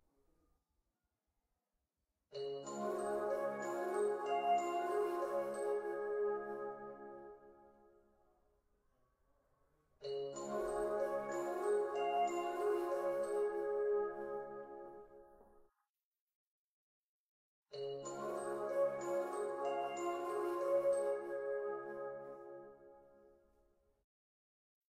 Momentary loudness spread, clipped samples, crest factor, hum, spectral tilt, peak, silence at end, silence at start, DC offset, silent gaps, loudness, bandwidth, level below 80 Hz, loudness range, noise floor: 15 LU; under 0.1%; 16 dB; none; -4.5 dB/octave; -26 dBFS; 1.85 s; 2.3 s; under 0.1%; 15.89-15.95 s, 16.04-16.12 s, 16.19-16.28 s, 16.34-17.62 s; -40 LUFS; 15.5 kHz; -76 dBFS; 14 LU; -89 dBFS